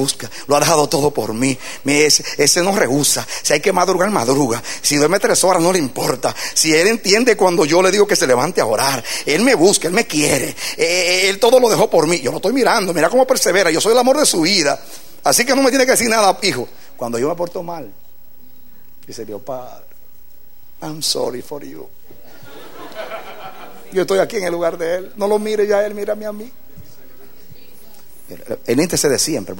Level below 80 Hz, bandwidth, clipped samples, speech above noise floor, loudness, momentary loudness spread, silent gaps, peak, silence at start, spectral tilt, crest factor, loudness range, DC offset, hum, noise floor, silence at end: -54 dBFS; 16.5 kHz; under 0.1%; 32 dB; -15 LUFS; 17 LU; none; 0 dBFS; 0 s; -3 dB/octave; 16 dB; 12 LU; 2%; none; -47 dBFS; 0 s